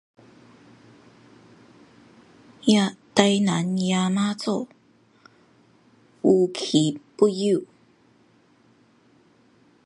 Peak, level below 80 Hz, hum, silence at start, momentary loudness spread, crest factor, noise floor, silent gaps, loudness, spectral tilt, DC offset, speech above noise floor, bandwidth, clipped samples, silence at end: 0 dBFS; -70 dBFS; none; 2.65 s; 7 LU; 24 dB; -59 dBFS; none; -22 LUFS; -5.5 dB/octave; under 0.1%; 38 dB; 11.5 kHz; under 0.1%; 2.2 s